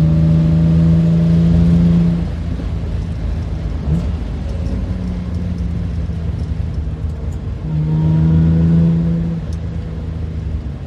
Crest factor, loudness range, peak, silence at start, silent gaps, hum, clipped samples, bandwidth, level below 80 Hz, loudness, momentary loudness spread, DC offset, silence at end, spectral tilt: 14 dB; 7 LU; -2 dBFS; 0 s; none; none; under 0.1%; 5.8 kHz; -24 dBFS; -17 LUFS; 11 LU; under 0.1%; 0 s; -10 dB/octave